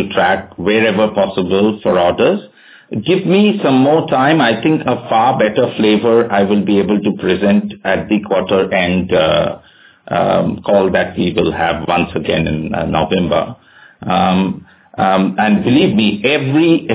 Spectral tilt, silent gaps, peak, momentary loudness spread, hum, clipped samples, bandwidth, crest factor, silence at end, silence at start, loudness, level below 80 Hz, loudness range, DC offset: -10.5 dB/octave; none; 0 dBFS; 6 LU; none; under 0.1%; 4 kHz; 14 dB; 0 s; 0 s; -14 LUFS; -40 dBFS; 3 LU; under 0.1%